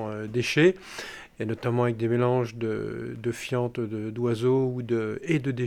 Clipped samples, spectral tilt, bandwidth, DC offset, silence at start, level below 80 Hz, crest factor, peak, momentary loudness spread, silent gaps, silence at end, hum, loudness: under 0.1%; -6.5 dB/octave; 14 kHz; under 0.1%; 0 s; -60 dBFS; 18 dB; -10 dBFS; 11 LU; none; 0 s; none; -27 LUFS